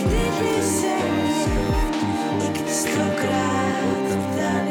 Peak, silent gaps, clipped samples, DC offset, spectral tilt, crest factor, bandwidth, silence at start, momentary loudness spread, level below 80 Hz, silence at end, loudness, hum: -12 dBFS; none; under 0.1%; under 0.1%; -5 dB/octave; 10 dB; 19 kHz; 0 s; 2 LU; -32 dBFS; 0 s; -22 LUFS; none